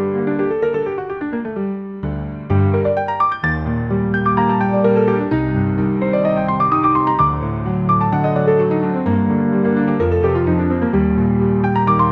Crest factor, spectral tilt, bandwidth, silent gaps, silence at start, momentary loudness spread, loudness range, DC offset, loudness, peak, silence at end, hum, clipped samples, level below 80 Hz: 14 dB; -10.5 dB/octave; 5.6 kHz; none; 0 s; 8 LU; 3 LU; 0.1%; -17 LUFS; -2 dBFS; 0 s; none; under 0.1%; -38 dBFS